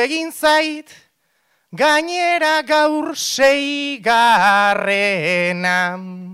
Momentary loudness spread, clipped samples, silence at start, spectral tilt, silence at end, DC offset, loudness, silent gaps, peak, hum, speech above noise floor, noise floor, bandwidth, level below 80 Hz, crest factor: 8 LU; under 0.1%; 0 s; -3 dB/octave; 0 s; under 0.1%; -16 LUFS; none; -4 dBFS; none; 48 dB; -64 dBFS; 16 kHz; -60 dBFS; 12 dB